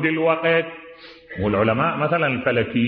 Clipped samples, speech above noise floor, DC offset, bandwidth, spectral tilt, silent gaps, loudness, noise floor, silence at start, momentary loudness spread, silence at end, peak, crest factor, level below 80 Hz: under 0.1%; 21 dB; under 0.1%; 5.4 kHz; -10 dB/octave; none; -20 LUFS; -41 dBFS; 0 s; 16 LU; 0 s; -6 dBFS; 16 dB; -52 dBFS